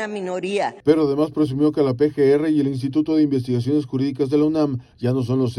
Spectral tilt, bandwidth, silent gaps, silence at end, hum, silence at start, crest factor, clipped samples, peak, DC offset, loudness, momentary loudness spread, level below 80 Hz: -8 dB/octave; 11.5 kHz; none; 0 s; none; 0 s; 16 dB; under 0.1%; -4 dBFS; under 0.1%; -20 LUFS; 6 LU; -56 dBFS